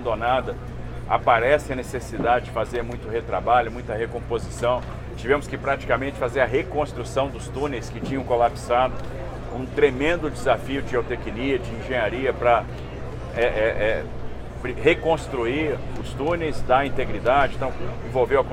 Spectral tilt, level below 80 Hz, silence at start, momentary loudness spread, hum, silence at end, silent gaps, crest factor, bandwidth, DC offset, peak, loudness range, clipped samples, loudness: -6 dB/octave; -36 dBFS; 0 s; 12 LU; none; 0 s; none; 20 dB; 16 kHz; under 0.1%; -4 dBFS; 2 LU; under 0.1%; -24 LUFS